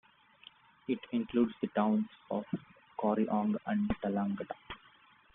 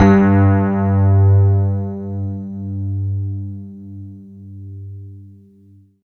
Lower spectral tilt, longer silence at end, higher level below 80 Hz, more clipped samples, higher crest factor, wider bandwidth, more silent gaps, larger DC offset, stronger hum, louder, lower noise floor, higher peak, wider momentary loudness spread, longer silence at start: second, -6.5 dB/octave vs -10.5 dB/octave; second, 0.6 s vs 0.8 s; second, -62 dBFS vs -46 dBFS; neither; about the same, 18 dB vs 16 dB; about the same, 3.9 kHz vs 4.2 kHz; neither; neither; neither; second, -34 LUFS vs -16 LUFS; first, -63 dBFS vs -48 dBFS; second, -16 dBFS vs 0 dBFS; second, 14 LU vs 23 LU; first, 0.9 s vs 0 s